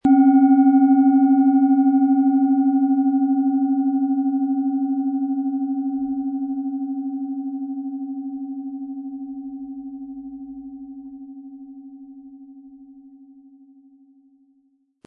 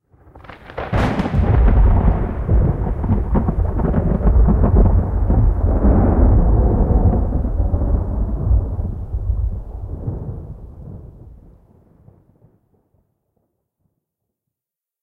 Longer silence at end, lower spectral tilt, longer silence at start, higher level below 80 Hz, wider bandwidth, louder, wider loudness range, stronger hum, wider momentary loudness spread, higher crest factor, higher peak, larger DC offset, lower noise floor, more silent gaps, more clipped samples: second, 2 s vs 3.7 s; about the same, -10 dB/octave vs -10.5 dB/octave; second, 0.05 s vs 0.35 s; second, -64 dBFS vs -18 dBFS; second, 2.4 kHz vs 4.2 kHz; about the same, -19 LUFS vs -18 LUFS; first, 22 LU vs 14 LU; neither; first, 23 LU vs 16 LU; about the same, 14 dB vs 16 dB; second, -6 dBFS vs -2 dBFS; neither; second, -64 dBFS vs -87 dBFS; neither; neither